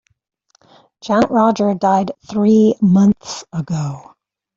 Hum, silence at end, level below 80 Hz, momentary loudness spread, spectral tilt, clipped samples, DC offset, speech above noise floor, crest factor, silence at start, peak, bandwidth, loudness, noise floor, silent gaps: none; 0.55 s; -54 dBFS; 14 LU; -7 dB/octave; under 0.1%; under 0.1%; 36 dB; 14 dB; 1.05 s; -2 dBFS; 7.6 kHz; -15 LUFS; -51 dBFS; none